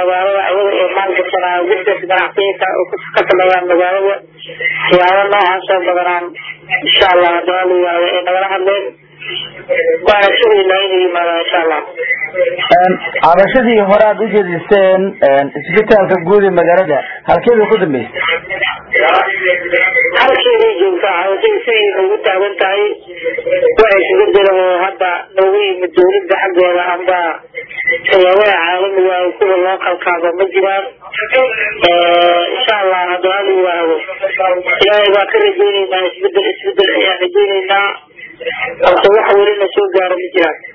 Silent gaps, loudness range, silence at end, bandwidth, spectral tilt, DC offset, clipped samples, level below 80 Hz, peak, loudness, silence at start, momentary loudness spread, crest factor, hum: none; 2 LU; 0.05 s; 6 kHz; -6.5 dB/octave; under 0.1%; 0.3%; -48 dBFS; 0 dBFS; -11 LUFS; 0 s; 7 LU; 12 dB; none